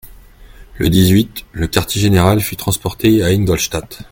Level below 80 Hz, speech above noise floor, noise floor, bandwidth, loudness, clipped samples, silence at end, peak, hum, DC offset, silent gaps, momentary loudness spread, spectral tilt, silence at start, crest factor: -34 dBFS; 25 dB; -39 dBFS; 17 kHz; -15 LUFS; under 0.1%; 0.1 s; 0 dBFS; none; under 0.1%; none; 8 LU; -5.5 dB/octave; 0.05 s; 14 dB